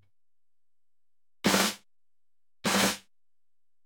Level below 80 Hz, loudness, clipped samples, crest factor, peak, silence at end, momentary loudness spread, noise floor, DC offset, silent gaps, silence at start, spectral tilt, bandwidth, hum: -66 dBFS; -27 LUFS; under 0.1%; 24 dB; -10 dBFS; 0.85 s; 13 LU; under -90 dBFS; under 0.1%; none; 1.45 s; -2.5 dB/octave; 17.5 kHz; none